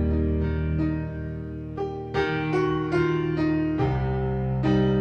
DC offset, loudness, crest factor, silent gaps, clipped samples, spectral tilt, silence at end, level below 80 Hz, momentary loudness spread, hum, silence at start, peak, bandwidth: under 0.1%; -26 LUFS; 14 dB; none; under 0.1%; -9 dB/octave; 0 s; -34 dBFS; 9 LU; none; 0 s; -10 dBFS; 6.6 kHz